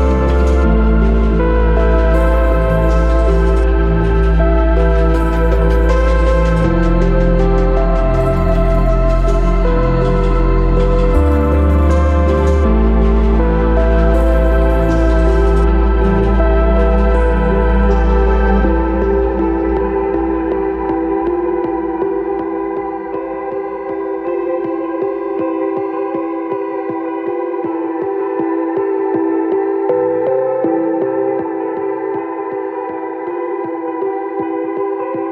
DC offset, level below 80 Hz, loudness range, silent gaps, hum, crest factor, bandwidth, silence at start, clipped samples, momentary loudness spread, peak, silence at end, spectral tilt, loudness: under 0.1%; -16 dBFS; 6 LU; none; none; 12 dB; 5.8 kHz; 0 s; under 0.1%; 7 LU; -2 dBFS; 0 s; -9 dB/octave; -15 LUFS